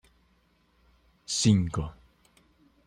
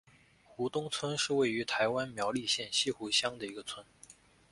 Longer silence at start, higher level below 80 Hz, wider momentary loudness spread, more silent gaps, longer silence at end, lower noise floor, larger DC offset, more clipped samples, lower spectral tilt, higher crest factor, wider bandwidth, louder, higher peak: first, 1.3 s vs 0.5 s; first, -52 dBFS vs -70 dBFS; first, 18 LU vs 11 LU; neither; first, 0.95 s vs 0.4 s; first, -67 dBFS vs -62 dBFS; neither; neither; first, -5 dB/octave vs -2.5 dB/octave; about the same, 22 dB vs 18 dB; about the same, 10.5 kHz vs 11.5 kHz; first, -27 LUFS vs -32 LUFS; first, -10 dBFS vs -16 dBFS